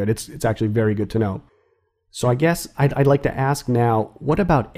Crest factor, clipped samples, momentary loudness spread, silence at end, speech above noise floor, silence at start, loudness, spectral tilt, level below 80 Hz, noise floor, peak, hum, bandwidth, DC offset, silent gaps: 16 dB; under 0.1%; 6 LU; 0.1 s; 46 dB; 0 s; -20 LUFS; -7 dB/octave; -42 dBFS; -65 dBFS; -4 dBFS; none; 15.5 kHz; under 0.1%; none